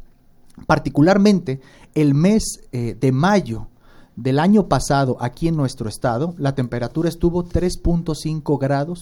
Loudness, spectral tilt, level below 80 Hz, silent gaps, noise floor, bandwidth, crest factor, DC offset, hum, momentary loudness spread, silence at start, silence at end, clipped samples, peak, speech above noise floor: -19 LUFS; -6.5 dB/octave; -34 dBFS; none; -48 dBFS; 16.5 kHz; 18 dB; under 0.1%; none; 11 LU; 0.55 s; 0 s; under 0.1%; -2 dBFS; 30 dB